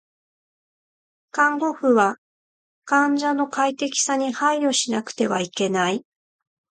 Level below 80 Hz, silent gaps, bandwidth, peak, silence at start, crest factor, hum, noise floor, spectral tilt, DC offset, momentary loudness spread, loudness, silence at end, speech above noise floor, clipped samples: -74 dBFS; 2.18-2.82 s; 9.6 kHz; -4 dBFS; 1.35 s; 18 dB; none; under -90 dBFS; -3 dB/octave; under 0.1%; 5 LU; -21 LUFS; 0.75 s; over 69 dB; under 0.1%